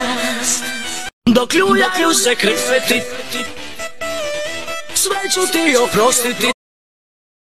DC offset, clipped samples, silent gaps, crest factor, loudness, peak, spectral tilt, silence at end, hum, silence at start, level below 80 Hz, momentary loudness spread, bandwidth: 2%; under 0.1%; 1.13-1.22 s; 16 dB; -16 LUFS; -2 dBFS; -2 dB/octave; 0.9 s; none; 0 s; -50 dBFS; 11 LU; 14 kHz